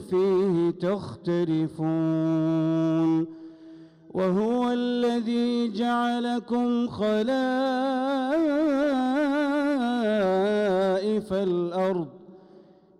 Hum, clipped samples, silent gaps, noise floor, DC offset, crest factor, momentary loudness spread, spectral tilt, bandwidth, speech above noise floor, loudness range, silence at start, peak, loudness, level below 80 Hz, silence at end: none; under 0.1%; none; -53 dBFS; under 0.1%; 6 dB; 5 LU; -7.5 dB/octave; 11 kHz; 29 dB; 2 LU; 0 s; -18 dBFS; -25 LUFS; -64 dBFS; 0.65 s